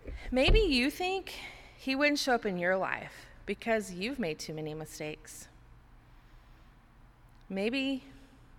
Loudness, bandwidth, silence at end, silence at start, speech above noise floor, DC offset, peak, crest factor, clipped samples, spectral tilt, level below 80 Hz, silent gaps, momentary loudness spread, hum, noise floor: -32 LUFS; 16.5 kHz; 0 s; 0.05 s; 27 dB; under 0.1%; -12 dBFS; 20 dB; under 0.1%; -4.5 dB/octave; -40 dBFS; none; 17 LU; none; -58 dBFS